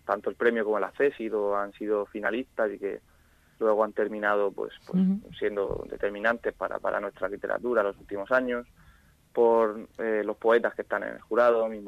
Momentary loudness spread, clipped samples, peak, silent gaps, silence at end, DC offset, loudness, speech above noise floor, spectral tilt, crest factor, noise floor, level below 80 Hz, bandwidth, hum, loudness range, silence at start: 9 LU; under 0.1%; -10 dBFS; none; 0 s; under 0.1%; -28 LUFS; 31 dB; -7.5 dB/octave; 18 dB; -58 dBFS; -58 dBFS; 13 kHz; none; 3 LU; 0.05 s